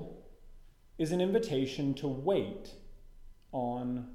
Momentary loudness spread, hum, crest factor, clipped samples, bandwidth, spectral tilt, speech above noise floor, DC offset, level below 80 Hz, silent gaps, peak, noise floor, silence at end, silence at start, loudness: 18 LU; none; 18 dB; under 0.1%; 15 kHz; -6.5 dB/octave; 21 dB; under 0.1%; -54 dBFS; none; -18 dBFS; -54 dBFS; 0 s; 0 s; -33 LUFS